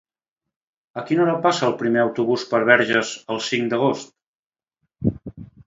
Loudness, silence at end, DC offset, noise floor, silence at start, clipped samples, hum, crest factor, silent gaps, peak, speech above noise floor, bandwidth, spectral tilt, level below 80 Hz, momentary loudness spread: -20 LUFS; 0.2 s; under 0.1%; under -90 dBFS; 0.95 s; under 0.1%; none; 22 dB; 4.26-4.50 s; 0 dBFS; over 70 dB; 7.8 kHz; -5 dB/octave; -54 dBFS; 15 LU